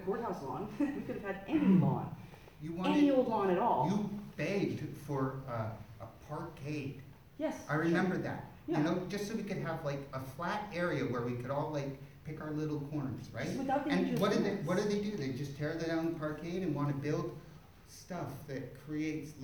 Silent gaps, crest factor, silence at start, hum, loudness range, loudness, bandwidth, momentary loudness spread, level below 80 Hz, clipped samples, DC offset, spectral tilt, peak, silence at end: none; 18 dB; 0 s; none; 7 LU; -36 LUFS; over 20 kHz; 14 LU; -62 dBFS; under 0.1%; under 0.1%; -7 dB/octave; -16 dBFS; 0 s